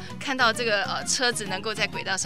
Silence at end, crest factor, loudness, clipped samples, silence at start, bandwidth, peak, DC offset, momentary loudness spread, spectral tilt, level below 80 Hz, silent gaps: 0 s; 20 dB; -24 LUFS; under 0.1%; 0 s; 16 kHz; -8 dBFS; 0.8%; 7 LU; -2 dB/octave; -56 dBFS; none